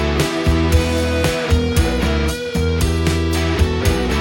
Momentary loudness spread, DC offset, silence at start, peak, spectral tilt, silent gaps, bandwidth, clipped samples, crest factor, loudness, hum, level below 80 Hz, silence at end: 3 LU; under 0.1%; 0 s; -2 dBFS; -5.5 dB/octave; none; 17 kHz; under 0.1%; 14 dB; -17 LUFS; none; -22 dBFS; 0 s